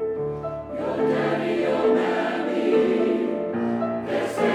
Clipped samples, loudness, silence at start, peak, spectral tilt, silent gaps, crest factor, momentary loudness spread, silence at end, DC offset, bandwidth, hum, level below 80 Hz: under 0.1%; -24 LUFS; 0 s; -8 dBFS; -6.5 dB/octave; none; 14 dB; 8 LU; 0 s; under 0.1%; 11.5 kHz; none; -56 dBFS